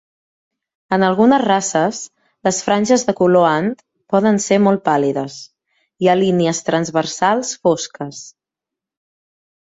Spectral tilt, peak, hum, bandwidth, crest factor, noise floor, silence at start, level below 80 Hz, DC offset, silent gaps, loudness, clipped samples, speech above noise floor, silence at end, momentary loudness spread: -5 dB/octave; -2 dBFS; none; 8 kHz; 16 dB; -85 dBFS; 0.9 s; -60 dBFS; under 0.1%; none; -16 LUFS; under 0.1%; 70 dB; 1.4 s; 16 LU